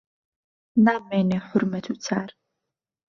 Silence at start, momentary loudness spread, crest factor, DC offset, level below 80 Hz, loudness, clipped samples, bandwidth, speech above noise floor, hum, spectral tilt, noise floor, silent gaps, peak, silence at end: 0.75 s; 10 LU; 20 dB; under 0.1%; -68 dBFS; -24 LUFS; under 0.1%; 7.2 kHz; 61 dB; none; -6.5 dB/octave; -84 dBFS; none; -6 dBFS; 0.8 s